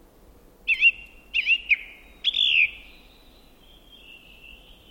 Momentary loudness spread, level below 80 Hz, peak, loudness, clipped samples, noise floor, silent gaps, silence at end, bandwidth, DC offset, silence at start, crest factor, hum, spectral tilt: 13 LU; -54 dBFS; -8 dBFS; -21 LUFS; under 0.1%; -52 dBFS; none; 0.4 s; 17 kHz; under 0.1%; 0.65 s; 18 dB; none; 0 dB/octave